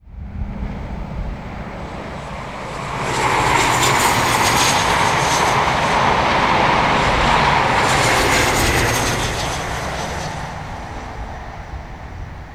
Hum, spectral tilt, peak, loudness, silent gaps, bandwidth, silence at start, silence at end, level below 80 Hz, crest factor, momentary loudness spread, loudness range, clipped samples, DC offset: none; -3 dB/octave; -2 dBFS; -16 LUFS; none; 18 kHz; 0.05 s; 0 s; -32 dBFS; 16 dB; 16 LU; 9 LU; under 0.1%; 0.4%